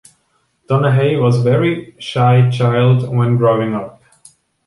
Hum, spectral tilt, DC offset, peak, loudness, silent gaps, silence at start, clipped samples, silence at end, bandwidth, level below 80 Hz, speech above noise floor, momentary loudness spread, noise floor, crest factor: none; -8 dB/octave; under 0.1%; -2 dBFS; -14 LUFS; none; 0.7 s; under 0.1%; 0.75 s; 11.5 kHz; -52 dBFS; 49 dB; 10 LU; -62 dBFS; 14 dB